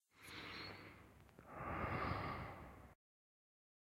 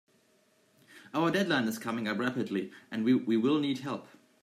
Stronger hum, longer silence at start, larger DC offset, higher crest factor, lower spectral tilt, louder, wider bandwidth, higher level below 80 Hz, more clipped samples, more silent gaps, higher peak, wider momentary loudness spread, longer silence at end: neither; second, 0.15 s vs 0.95 s; neither; first, 22 dB vs 16 dB; about the same, -6 dB/octave vs -5.5 dB/octave; second, -48 LUFS vs -31 LUFS; about the same, 16 kHz vs 15.5 kHz; first, -62 dBFS vs -78 dBFS; neither; neither; second, -30 dBFS vs -16 dBFS; first, 20 LU vs 10 LU; first, 1 s vs 0.4 s